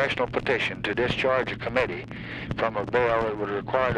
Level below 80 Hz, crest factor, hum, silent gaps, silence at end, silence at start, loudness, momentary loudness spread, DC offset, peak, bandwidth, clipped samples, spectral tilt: -48 dBFS; 16 dB; none; none; 0 s; 0 s; -26 LUFS; 8 LU; under 0.1%; -10 dBFS; 10 kHz; under 0.1%; -6 dB/octave